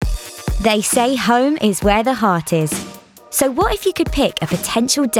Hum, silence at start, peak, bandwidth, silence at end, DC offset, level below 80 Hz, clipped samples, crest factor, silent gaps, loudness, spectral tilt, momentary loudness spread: none; 0 s; -2 dBFS; 18.5 kHz; 0 s; under 0.1%; -30 dBFS; under 0.1%; 16 dB; none; -17 LUFS; -4 dB/octave; 8 LU